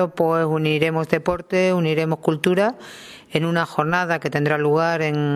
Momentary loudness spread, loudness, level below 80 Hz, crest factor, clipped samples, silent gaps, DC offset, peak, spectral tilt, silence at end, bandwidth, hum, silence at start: 5 LU; -20 LUFS; -54 dBFS; 18 dB; under 0.1%; none; under 0.1%; -2 dBFS; -6.5 dB/octave; 0 s; 14 kHz; none; 0 s